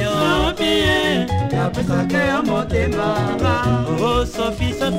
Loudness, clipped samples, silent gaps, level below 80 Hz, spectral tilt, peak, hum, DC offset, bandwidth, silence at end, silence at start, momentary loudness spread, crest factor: -18 LUFS; under 0.1%; none; -32 dBFS; -5.5 dB/octave; -4 dBFS; none; under 0.1%; 16 kHz; 0 s; 0 s; 4 LU; 14 dB